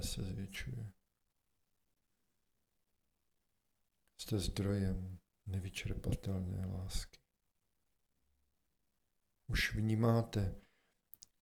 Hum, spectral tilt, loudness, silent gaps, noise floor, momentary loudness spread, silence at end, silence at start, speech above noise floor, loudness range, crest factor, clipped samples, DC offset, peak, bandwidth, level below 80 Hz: none; -5.5 dB/octave; -39 LUFS; none; -85 dBFS; 17 LU; 0.8 s; 0 s; 47 dB; 11 LU; 20 dB; under 0.1%; under 0.1%; -22 dBFS; 18 kHz; -52 dBFS